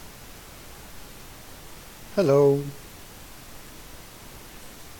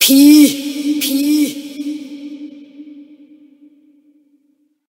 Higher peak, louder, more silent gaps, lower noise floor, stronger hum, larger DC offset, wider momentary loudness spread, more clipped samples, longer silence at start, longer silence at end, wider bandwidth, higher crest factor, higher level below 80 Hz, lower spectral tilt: second, -10 dBFS vs 0 dBFS; second, -22 LUFS vs -13 LUFS; neither; second, -44 dBFS vs -60 dBFS; neither; neither; about the same, 24 LU vs 24 LU; neither; about the same, 0 s vs 0 s; second, 0 s vs 1.9 s; about the same, 17.5 kHz vs 16.5 kHz; about the same, 20 dB vs 16 dB; first, -50 dBFS vs -68 dBFS; first, -6.5 dB/octave vs -1.5 dB/octave